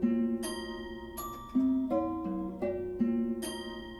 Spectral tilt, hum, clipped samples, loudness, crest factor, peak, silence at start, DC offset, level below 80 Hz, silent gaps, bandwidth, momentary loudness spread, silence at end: -5.5 dB/octave; none; under 0.1%; -34 LUFS; 14 dB; -18 dBFS; 0 s; under 0.1%; -54 dBFS; none; 13.5 kHz; 11 LU; 0 s